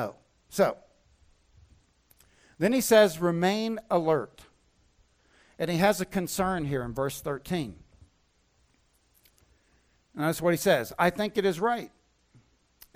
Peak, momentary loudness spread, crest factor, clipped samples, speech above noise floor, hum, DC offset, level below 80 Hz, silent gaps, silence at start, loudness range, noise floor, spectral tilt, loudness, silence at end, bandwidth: -10 dBFS; 12 LU; 20 dB; under 0.1%; 42 dB; none; under 0.1%; -58 dBFS; none; 0 s; 9 LU; -68 dBFS; -5 dB/octave; -27 LUFS; 1.1 s; 16.5 kHz